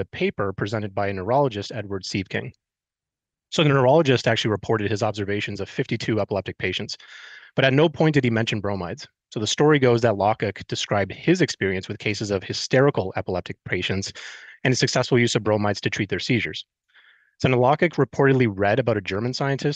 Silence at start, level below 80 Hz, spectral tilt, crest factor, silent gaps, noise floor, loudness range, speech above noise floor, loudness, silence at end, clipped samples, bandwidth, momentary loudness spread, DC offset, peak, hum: 0 s; -56 dBFS; -5.5 dB/octave; 18 dB; none; -89 dBFS; 3 LU; 67 dB; -22 LUFS; 0 s; under 0.1%; 9.2 kHz; 12 LU; under 0.1%; -4 dBFS; none